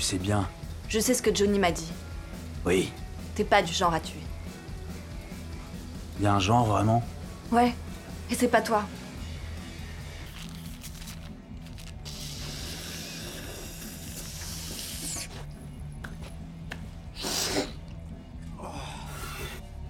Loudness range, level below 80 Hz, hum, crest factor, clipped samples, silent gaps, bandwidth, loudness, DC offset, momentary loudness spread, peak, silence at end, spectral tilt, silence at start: 12 LU; -44 dBFS; none; 24 dB; under 0.1%; none; 17.5 kHz; -30 LUFS; under 0.1%; 17 LU; -8 dBFS; 0 s; -4.5 dB/octave; 0 s